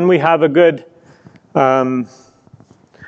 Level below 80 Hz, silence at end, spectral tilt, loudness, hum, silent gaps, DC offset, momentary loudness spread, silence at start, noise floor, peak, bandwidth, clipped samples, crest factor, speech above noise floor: -64 dBFS; 0 s; -7.5 dB/octave; -14 LUFS; none; none; under 0.1%; 14 LU; 0 s; -46 dBFS; 0 dBFS; 7.2 kHz; under 0.1%; 16 dB; 33 dB